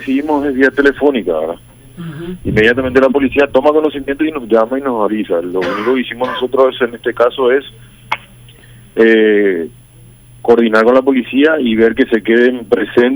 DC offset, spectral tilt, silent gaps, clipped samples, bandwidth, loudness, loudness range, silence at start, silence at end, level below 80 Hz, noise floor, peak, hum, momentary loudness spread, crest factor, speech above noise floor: under 0.1%; -6.5 dB/octave; none; under 0.1%; over 20 kHz; -13 LUFS; 3 LU; 0 s; 0 s; -42 dBFS; -40 dBFS; 0 dBFS; none; 13 LU; 12 dB; 28 dB